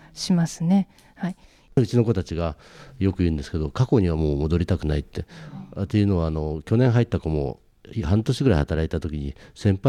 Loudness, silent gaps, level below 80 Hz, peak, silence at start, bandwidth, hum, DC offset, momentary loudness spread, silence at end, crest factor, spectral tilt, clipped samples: -24 LUFS; none; -36 dBFS; -8 dBFS; 0.15 s; 12 kHz; none; under 0.1%; 14 LU; 0 s; 16 dB; -7.5 dB/octave; under 0.1%